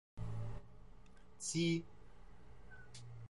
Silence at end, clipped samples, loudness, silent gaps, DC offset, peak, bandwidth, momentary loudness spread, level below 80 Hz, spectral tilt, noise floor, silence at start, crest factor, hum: 0 s; under 0.1%; -41 LUFS; none; under 0.1%; -26 dBFS; 11 kHz; 26 LU; -60 dBFS; -4.5 dB/octave; -62 dBFS; 0.15 s; 18 dB; none